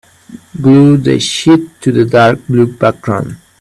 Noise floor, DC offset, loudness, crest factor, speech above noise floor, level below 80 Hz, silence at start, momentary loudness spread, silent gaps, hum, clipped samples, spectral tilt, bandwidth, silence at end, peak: -35 dBFS; under 0.1%; -10 LUFS; 10 dB; 26 dB; -46 dBFS; 0.3 s; 10 LU; none; none; under 0.1%; -6.5 dB/octave; 12 kHz; 0.25 s; 0 dBFS